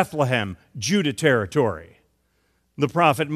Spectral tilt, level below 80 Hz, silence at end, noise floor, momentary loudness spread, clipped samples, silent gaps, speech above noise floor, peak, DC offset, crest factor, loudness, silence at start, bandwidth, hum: -5 dB/octave; -58 dBFS; 0 s; -67 dBFS; 9 LU; under 0.1%; none; 46 dB; -4 dBFS; under 0.1%; 18 dB; -22 LUFS; 0 s; 15 kHz; none